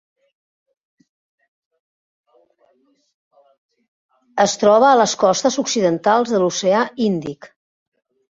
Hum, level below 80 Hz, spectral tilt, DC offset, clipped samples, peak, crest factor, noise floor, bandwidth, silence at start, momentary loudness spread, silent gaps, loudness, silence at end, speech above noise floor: none; -64 dBFS; -4 dB/octave; under 0.1%; under 0.1%; -2 dBFS; 18 dB; -61 dBFS; 7.8 kHz; 4.35 s; 11 LU; none; -16 LUFS; 0.85 s; 45 dB